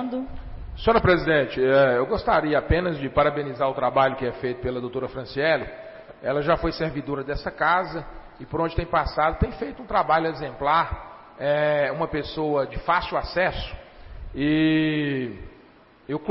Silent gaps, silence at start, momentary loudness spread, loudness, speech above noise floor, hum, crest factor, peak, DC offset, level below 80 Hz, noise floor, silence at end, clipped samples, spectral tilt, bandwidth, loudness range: none; 0 s; 15 LU; -24 LUFS; 29 dB; none; 16 dB; -8 dBFS; under 0.1%; -40 dBFS; -52 dBFS; 0 s; under 0.1%; -10.5 dB/octave; 5.8 kHz; 5 LU